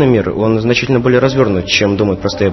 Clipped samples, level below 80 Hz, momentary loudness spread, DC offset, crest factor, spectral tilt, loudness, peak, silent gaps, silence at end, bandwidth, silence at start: under 0.1%; -38 dBFS; 4 LU; 0.1%; 12 dB; -6 dB/octave; -13 LUFS; 0 dBFS; none; 0 s; 6.2 kHz; 0 s